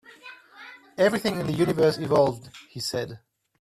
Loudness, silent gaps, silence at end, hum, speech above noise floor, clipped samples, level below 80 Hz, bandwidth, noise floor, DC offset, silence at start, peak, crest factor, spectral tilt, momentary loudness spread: -24 LUFS; none; 0.45 s; none; 24 dB; under 0.1%; -60 dBFS; 14.5 kHz; -47 dBFS; under 0.1%; 0.25 s; -8 dBFS; 18 dB; -5.5 dB/octave; 23 LU